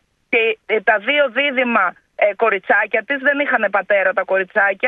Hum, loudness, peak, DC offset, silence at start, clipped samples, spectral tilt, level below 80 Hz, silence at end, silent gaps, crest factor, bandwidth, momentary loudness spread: none; -17 LUFS; -2 dBFS; under 0.1%; 0.3 s; under 0.1%; -6 dB/octave; -70 dBFS; 0 s; none; 16 dB; 4.3 kHz; 4 LU